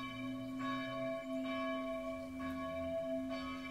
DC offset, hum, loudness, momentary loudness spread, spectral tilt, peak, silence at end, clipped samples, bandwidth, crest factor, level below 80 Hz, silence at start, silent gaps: under 0.1%; none; -41 LUFS; 4 LU; -6 dB/octave; -30 dBFS; 0 s; under 0.1%; 15.5 kHz; 12 dB; -66 dBFS; 0 s; none